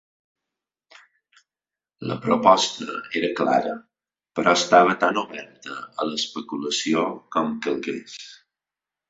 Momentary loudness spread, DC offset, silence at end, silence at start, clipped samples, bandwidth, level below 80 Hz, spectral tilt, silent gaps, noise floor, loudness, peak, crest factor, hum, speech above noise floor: 19 LU; under 0.1%; 0.75 s; 2 s; under 0.1%; 8 kHz; -68 dBFS; -3.5 dB/octave; none; under -90 dBFS; -22 LUFS; -2 dBFS; 22 dB; none; over 68 dB